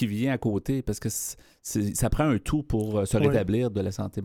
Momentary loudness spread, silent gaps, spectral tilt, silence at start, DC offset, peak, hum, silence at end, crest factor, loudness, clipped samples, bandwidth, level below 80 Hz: 8 LU; none; -6 dB/octave; 0 s; under 0.1%; -10 dBFS; none; 0 s; 16 dB; -27 LUFS; under 0.1%; 17.5 kHz; -40 dBFS